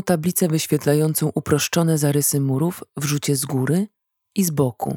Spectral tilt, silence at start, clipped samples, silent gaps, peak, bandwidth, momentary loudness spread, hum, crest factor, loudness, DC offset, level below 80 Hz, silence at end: -5 dB/octave; 0 s; under 0.1%; none; -4 dBFS; 19 kHz; 6 LU; none; 16 dB; -20 LUFS; under 0.1%; -58 dBFS; 0 s